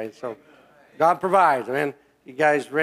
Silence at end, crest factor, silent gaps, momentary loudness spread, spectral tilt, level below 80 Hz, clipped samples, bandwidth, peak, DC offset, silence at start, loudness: 0 s; 18 dB; none; 17 LU; -5.5 dB/octave; -72 dBFS; under 0.1%; 15.5 kHz; -6 dBFS; under 0.1%; 0 s; -21 LUFS